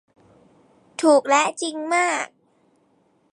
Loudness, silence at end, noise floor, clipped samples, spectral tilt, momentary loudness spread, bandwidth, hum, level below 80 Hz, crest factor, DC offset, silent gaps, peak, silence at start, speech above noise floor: -20 LUFS; 1.05 s; -63 dBFS; under 0.1%; -1.5 dB/octave; 14 LU; 11.5 kHz; none; -78 dBFS; 18 dB; under 0.1%; none; -6 dBFS; 1 s; 43 dB